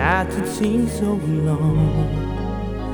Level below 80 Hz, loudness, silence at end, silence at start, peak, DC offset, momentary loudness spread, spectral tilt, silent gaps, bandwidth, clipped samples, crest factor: -30 dBFS; -21 LUFS; 0 s; 0 s; -4 dBFS; under 0.1%; 7 LU; -7 dB/octave; none; over 20 kHz; under 0.1%; 16 dB